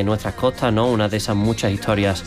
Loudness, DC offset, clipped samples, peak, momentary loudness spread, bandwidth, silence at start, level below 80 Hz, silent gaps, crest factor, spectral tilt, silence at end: -20 LUFS; under 0.1%; under 0.1%; -6 dBFS; 3 LU; 15.5 kHz; 0 s; -40 dBFS; none; 12 dB; -6 dB/octave; 0 s